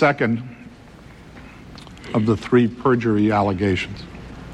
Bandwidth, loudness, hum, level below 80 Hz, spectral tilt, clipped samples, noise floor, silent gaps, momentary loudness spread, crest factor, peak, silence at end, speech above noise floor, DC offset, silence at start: 9.8 kHz; -20 LUFS; none; -46 dBFS; -7.5 dB/octave; under 0.1%; -43 dBFS; none; 23 LU; 16 dB; -4 dBFS; 0 s; 24 dB; under 0.1%; 0 s